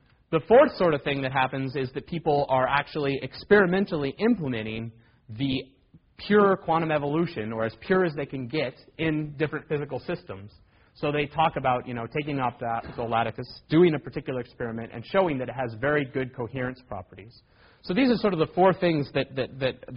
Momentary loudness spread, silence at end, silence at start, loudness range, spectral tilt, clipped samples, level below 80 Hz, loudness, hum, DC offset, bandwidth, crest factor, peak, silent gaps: 12 LU; 0 s; 0.3 s; 5 LU; -5 dB/octave; under 0.1%; -54 dBFS; -26 LUFS; none; under 0.1%; 5.4 kHz; 20 dB; -6 dBFS; none